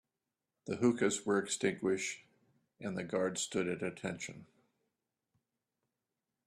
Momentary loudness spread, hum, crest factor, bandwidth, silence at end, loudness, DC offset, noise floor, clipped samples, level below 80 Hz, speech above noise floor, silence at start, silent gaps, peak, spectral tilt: 14 LU; none; 20 dB; 13.5 kHz; 2 s; -36 LUFS; under 0.1%; -90 dBFS; under 0.1%; -76 dBFS; 55 dB; 0.65 s; none; -18 dBFS; -4 dB/octave